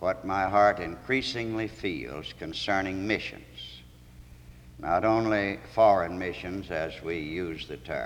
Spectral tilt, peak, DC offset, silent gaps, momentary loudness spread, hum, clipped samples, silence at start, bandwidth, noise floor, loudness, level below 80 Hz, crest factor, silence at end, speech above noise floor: -5.5 dB/octave; -10 dBFS; under 0.1%; none; 16 LU; none; under 0.1%; 0 s; 17 kHz; -50 dBFS; -28 LUFS; -52 dBFS; 18 dB; 0 s; 22 dB